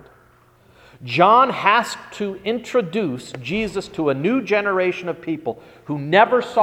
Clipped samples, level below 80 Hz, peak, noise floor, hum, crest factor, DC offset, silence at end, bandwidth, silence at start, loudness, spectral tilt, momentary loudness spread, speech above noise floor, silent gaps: under 0.1%; -56 dBFS; 0 dBFS; -53 dBFS; none; 20 dB; under 0.1%; 0 s; 15 kHz; 1 s; -19 LUFS; -5.5 dB/octave; 14 LU; 34 dB; none